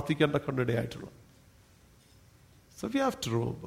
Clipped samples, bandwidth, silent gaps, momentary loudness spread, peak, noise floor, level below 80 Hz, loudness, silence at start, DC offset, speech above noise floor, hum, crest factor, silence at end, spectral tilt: under 0.1%; 16 kHz; none; 14 LU; -12 dBFS; -60 dBFS; -60 dBFS; -31 LUFS; 0 s; under 0.1%; 29 dB; none; 22 dB; 0 s; -6 dB/octave